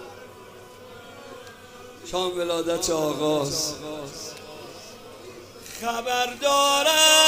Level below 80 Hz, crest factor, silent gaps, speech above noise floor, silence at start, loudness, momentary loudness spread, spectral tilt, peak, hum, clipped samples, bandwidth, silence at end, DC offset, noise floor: -56 dBFS; 22 dB; none; 22 dB; 0 s; -23 LUFS; 25 LU; -1.5 dB/octave; -4 dBFS; none; under 0.1%; 16 kHz; 0 s; under 0.1%; -45 dBFS